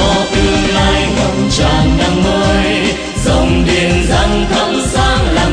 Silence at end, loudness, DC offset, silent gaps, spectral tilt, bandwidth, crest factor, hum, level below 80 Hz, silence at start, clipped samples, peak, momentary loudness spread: 0 s; -12 LUFS; under 0.1%; none; -5 dB/octave; 10.5 kHz; 12 dB; none; -18 dBFS; 0 s; under 0.1%; 0 dBFS; 2 LU